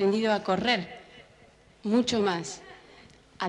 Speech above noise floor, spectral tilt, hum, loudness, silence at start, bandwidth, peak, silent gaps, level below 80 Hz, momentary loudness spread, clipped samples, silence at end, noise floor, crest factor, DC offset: 31 dB; -4.5 dB/octave; none; -27 LUFS; 0 s; 11 kHz; -10 dBFS; none; -64 dBFS; 18 LU; under 0.1%; 0 s; -57 dBFS; 18 dB; under 0.1%